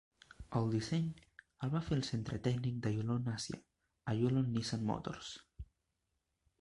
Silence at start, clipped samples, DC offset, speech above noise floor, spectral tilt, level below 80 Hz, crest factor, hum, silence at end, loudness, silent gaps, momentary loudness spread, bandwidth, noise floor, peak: 0.4 s; under 0.1%; under 0.1%; 48 dB; -6.5 dB/octave; -60 dBFS; 18 dB; none; 0.95 s; -38 LUFS; none; 16 LU; 11.5 kHz; -85 dBFS; -20 dBFS